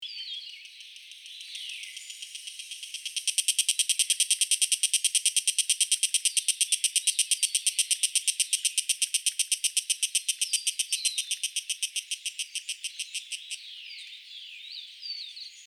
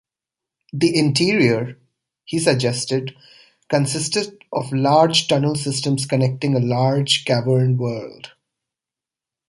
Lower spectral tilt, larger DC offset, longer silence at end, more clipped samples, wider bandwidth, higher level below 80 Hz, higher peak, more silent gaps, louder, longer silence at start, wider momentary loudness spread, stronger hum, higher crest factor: second, 13 dB/octave vs -5 dB/octave; neither; second, 0 s vs 1.2 s; neither; first, 19.5 kHz vs 11.5 kHz; second, under -90 dBFS vs -58 dBFS; second, -8 dBFS vs -2 dBFS; neither; second, -26 LUFS vs -19 LUFS; second, 0 s vs 0.75 s; first, 17 LU vs 11 LU; neither; about the same, 22 dB vs 18 dB